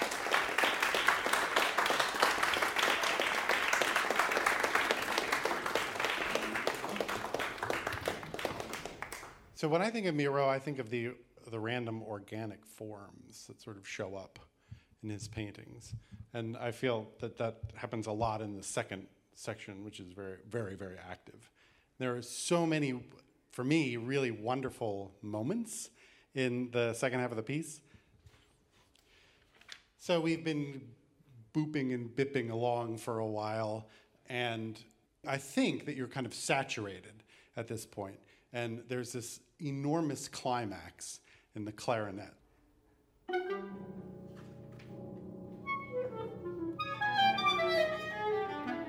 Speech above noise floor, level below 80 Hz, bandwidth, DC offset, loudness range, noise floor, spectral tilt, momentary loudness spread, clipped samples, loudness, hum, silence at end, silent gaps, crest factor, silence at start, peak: 32 dB; -66 dBFS; over 20 kHz; under 0.1%; 13 LU; -69 dBFS; -4 dB/octave; 18 LU; under 0.1%; -35 LUFS; none; 0 s; none; 26 dB; 0 s; -10 dBFS